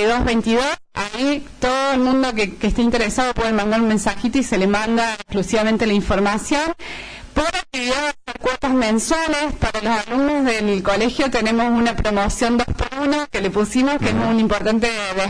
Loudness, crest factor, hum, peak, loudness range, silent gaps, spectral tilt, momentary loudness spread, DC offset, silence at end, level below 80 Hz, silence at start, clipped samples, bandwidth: -19 LUFS; 12 dB; none; -8 dBFS; 2 LU; none; -4.5 dB/octave; 5 LU; 0.3%; 0 s; -34 dBFS; 0 s; under 0.1%; 11 kHz